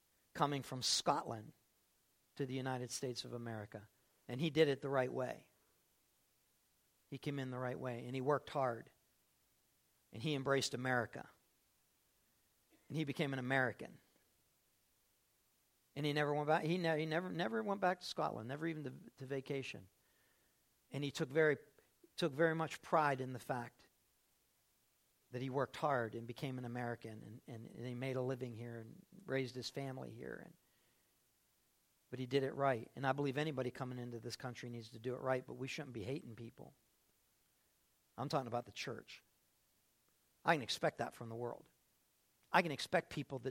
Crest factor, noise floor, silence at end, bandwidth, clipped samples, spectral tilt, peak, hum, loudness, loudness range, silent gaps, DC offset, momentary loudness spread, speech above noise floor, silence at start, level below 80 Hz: 26 dB; -78 dBFS; 0 s; 16.5 kHz; under 0.1%; -5 dB/octave; -16 dBFS; none; -40 LUFS; 8 LU; none; under 0.1%; 17 LU; 38 dB; 0.35 s; -80 dBFS